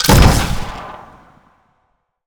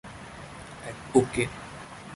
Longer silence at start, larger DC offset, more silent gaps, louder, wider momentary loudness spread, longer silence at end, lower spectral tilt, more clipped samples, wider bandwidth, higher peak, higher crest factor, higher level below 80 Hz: about the same, 0 s vs 0.05 s; neither; neither; first, -14 LUFS vs -27 LUFS; first, 24 LU vs 18 LU; first, 1.3 s vs 0 s; about the same, -4.5 dB/octave vs -5.5 dB/octave; neither; first, over 20 kHz vs 11.5 kHz; first, 0 dBFS vs -6 dBFS; second, 16 dB vs 24 dB; first, -20 dBFS vs -54 dBFS